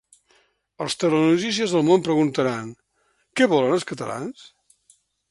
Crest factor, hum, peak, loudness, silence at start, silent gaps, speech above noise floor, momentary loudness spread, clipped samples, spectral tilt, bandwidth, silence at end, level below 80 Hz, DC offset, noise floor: 20 dB; none; -4 dBFS; -21 LUFS; 0.8 s; none; 47 dB; 14 LU; under 0.1%; -5 dB/octave; 11.5 kHz; 1 s; -66 dBFS; under 0.1%; -68 dBFS